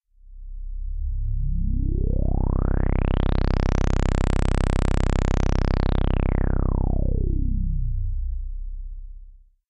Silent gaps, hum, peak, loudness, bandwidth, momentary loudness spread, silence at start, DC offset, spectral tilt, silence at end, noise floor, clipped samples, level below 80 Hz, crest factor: none; none; -8 dBFS; -25 LUFS; 8.6 kHz; 13 LU; 0.25 s; under 0.1%; -7.5 dB/octave; 0.35 s; -46 dBFS; under 0.1%; -24 dBFS; 14 dB